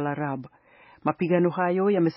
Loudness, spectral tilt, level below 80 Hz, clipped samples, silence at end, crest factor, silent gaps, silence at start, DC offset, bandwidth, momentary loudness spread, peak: -25 LUFS; -7 dB/octave; -70 dBFS; under 0.1%; 0 s; 18 dB; none; 0 s; under 0.1%; 5.6 kHz; 9 LU; -8 dBFS